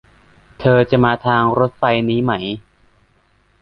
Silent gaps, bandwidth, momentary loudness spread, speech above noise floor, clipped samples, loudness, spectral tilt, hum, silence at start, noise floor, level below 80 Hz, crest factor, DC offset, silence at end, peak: none; 5.6 kHz; 9 LU; 42 dB; under 0.1%; -16 LUFS; -9 dB/octave; none; 0.6 s; -57 dBFS; -46 dBFS; 16 dB; under 0.1%; 1.05 s; -2 dBFS